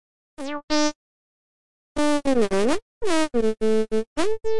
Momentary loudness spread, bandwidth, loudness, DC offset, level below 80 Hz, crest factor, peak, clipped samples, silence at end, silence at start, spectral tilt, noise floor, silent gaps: 10 LU; 11.5 kHz; -24 LUFS; 5%; -44 dBFS; 12 dB; -10 dBFS; under 0.1%; 0 s; 0.35 s; -4 dB/octave; under -90 dBFS; 0.63-0.68 s, 0.95-1.95 s, 2.82-3.01 s, 4.07-4.16 s